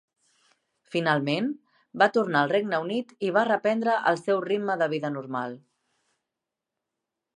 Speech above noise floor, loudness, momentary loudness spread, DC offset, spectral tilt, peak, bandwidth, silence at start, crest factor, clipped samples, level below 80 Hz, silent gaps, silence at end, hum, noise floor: 62 dB; -26 LUFS; 10 LU; under 0.1%; -6 dB/octave; -6 dBFS; 10.5 kHz; 0.9 s; 22 dB; under 0.1%; -80 dBFS; none; 1.8 s; none; -87 dBFS